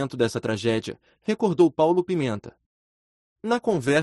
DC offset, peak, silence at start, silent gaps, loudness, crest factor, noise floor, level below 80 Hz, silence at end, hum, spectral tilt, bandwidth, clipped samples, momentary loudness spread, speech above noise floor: under 0.1%; -6 dBFS; 0 s; 2.66-3.36 s; -24 LUFS; 18 dB; under -90 dBFS; -62 dBFS; 0 s; none; -6 dB/octave; 11.5 kHz; under 0.1%; 14 LU; over 67 dB